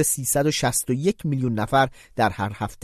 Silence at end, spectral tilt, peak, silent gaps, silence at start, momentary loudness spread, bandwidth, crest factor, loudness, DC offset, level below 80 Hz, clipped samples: 0.1 s; -4 dB/octave; -6 dBFS; none; 0 s; 5 LU; 14 kHz; 16 dB; -23 LUFS; under 0.1%; -48 dBFS; under 0.1%